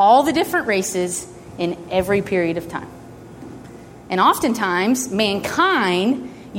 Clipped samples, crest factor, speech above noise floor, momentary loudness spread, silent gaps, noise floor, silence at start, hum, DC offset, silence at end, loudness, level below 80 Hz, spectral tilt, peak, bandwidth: under 0.1%; 16 dB; 21 dB; 21 LU; none; -39 dBFS; 0 s; none; under 0.1%; 0 s; -19 LUFS; -50 dBFS; -4 dB/octave; -2 dBFS; 16.5 kHz